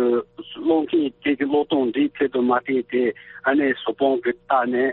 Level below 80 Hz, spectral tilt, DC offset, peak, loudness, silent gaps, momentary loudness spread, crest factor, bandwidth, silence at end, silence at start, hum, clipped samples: -62 dBFS; -3 dB/octave; under 0.1%; -6 dBFS; -22 LUFS; none; 5 LU; 16 dB; 4.2 kHz; 0 s; 0 s; none; under 0.1%